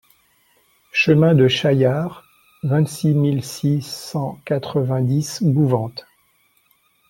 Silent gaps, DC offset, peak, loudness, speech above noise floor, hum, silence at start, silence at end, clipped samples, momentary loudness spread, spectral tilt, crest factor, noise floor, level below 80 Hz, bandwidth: none; under 0.1%; -2 dBFS; -19 LUFS; 43 dB; none; 0.95 s; 1.1 s; under 0.1%; 12 LU; -6.5 dB/octave; 16 dB; -61 dBFS; -56 dBFS; 16.5 kHz